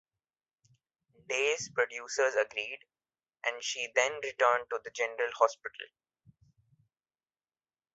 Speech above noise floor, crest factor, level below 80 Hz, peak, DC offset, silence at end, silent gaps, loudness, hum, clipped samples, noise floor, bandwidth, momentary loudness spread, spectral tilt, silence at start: over 58 dB; 24 dB; -80 dBFS; -10 dBFS; under 0.1%; 2.1 s; none; -31 LUFS; none; under 0.1%; under -90 dBFS; 8 kHz; 14 LU; 1.5 dB/octave; 1.3 s